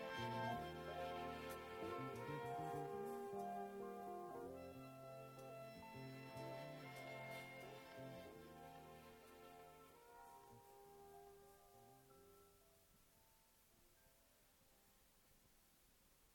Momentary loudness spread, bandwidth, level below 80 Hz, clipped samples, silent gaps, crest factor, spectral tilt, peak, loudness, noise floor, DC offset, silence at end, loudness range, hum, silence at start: 16 LU; 19 kHz; -76 dBFS; under 0.1%; none; 20 dB; -5.5 dB/octave; -34 dBFS; -53 LUFS; -74 dBFS; under 0.1%; 0 s; 16 LU; none; 0 s